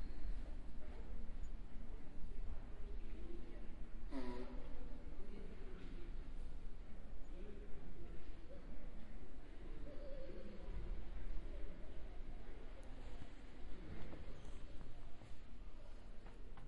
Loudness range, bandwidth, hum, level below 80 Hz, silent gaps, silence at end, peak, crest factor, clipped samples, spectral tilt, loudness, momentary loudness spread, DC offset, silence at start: 4 LU; 5 kHz; none; -50 dBFS; none; 0 s; -28 dBFS; 12 dB; under 0.1%; -7 dB/octave; -56 LUFS; 7 LU; under 0.1%; 0 s